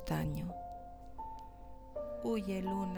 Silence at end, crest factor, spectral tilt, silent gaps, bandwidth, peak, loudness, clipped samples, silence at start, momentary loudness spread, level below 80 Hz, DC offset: 0 s; 16 dB; -7.5 dB/octave; none; over 20 kHz; -22 dBFS; -41 LUFS; under 0.1%; 0 s; 15 LU; -52 dBFS; under 0.1%